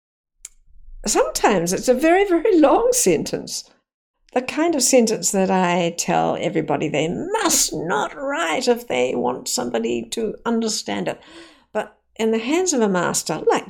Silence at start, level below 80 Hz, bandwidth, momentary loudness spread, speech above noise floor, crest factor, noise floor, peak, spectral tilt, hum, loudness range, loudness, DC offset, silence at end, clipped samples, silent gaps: 0.45 s; -48 dBFS; 18 kHz; 11 LU; 25 dB; 18 dB; -45 dBFS; -2 dBFS; -3.5 dB/octave; none; 5 LU; -20 LUFS; under 0.1%; 0 s; under 0.1%; 3.94-4.14 s